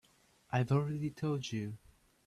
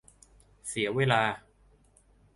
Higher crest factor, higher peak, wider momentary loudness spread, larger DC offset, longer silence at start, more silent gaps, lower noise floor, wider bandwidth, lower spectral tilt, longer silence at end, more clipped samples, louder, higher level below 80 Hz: second, 18 dB vs 24 dB; second, -20 dBFS vs -8 dBFS; second, 11 LU vs 17 LU; neither; second, 0.5 s vs 0.65 s; neither; first, -68 dBFS vs -62 dBFS; about the same, 12 kHz vs 11.5 kHz; first, -7 dB/octave vs -4.5 dB/octave; second, 0.5 s vs 0.95 s; neither; second, -36 LUFS vs -28 LUFS; second, -70 dBFS vs -62 dBFS